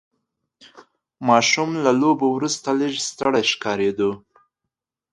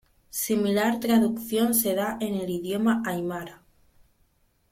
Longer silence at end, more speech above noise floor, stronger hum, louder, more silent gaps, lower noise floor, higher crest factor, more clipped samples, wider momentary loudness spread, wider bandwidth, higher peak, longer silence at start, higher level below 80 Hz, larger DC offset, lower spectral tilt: second, 0.95 s vs 1.15 s; first, 63 dB vs 41 dB; neither; first, -20 LUFS vs -25 LUFS; neither; first, -83 dBFS vs -66 dBFS; about the same, 20 dB vs 16 dB; neither; about the same, 8 LU vs 10 LU; second, 11.5 kHz vs 16.5 kHz; first, -2 dBFS vs -10 dBFS; first, 0.75 s vs 0.35 s; about the same, -64 dBFS vs -60 dBFS; neither; about the same, -3.5 dB/octave vs -4.5 dB/octave